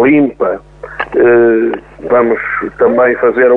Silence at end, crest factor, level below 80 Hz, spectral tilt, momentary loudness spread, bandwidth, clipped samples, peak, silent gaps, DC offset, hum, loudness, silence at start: 0 s; 10 dB; -44 dBFS; -9 dB/octave; 13 LU; 3.9 kHz; under 0.1%; 0 dBFS; none; under 0.1%; none; -11 LUFS; 0 s